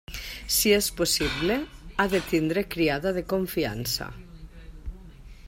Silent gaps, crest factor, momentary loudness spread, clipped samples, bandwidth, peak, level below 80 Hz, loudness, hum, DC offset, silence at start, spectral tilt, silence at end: none; 20 dB; 19 LU; under 0.1%; 16.5 kHz; -8 dBFS; -44 dBFS; -26 LUFS; none; under 0.1%; 0.1 s; -3.5 dB/octave; 0 s